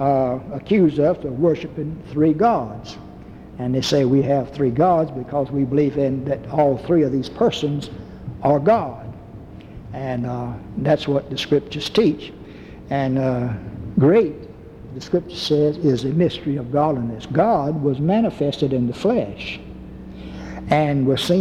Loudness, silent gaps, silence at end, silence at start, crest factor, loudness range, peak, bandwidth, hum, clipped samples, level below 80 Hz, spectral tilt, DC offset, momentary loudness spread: -20 LUFS; none; 0 s; 0 s; 16 dB; 3 LU; -4 dBFS; 13.5 kHz; none; under 0.1%; -46 dBFS; -7 dB/octave; under 0.1%; 19 LU